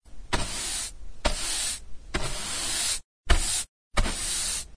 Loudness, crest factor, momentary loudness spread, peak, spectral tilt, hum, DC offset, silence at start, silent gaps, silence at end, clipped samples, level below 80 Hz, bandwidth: -28 LUFS; 22 dB; 7 LU; -6 dBFS; -1.5 dB/octave; none; under 0.1%; 0 s; 3.04-3.24 s, 3.68-3.91 s; 0 s; under 0.1%; -32 dBFS; 11 kHz